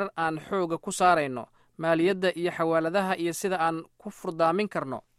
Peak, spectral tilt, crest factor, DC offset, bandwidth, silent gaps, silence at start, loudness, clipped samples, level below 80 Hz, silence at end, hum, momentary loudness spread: -10 dBFS; -5 dB/octave; 18 dB; under 0.1%; 15 kHz; none; 0 s; -27 LUFS; under 0.1%; -68 dBFS; 0.2 s; none; 13 LU